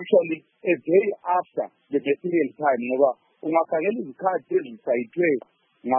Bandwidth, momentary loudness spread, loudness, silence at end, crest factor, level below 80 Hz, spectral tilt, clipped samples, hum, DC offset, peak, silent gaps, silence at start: 3.5 kHz; 8 LU; -24 LUFS; 0 s; 18 dB; -82 dBFS; -11 dB/octave; under 0.1%; none; under 0.1%; -6 dBFS; none; 0 s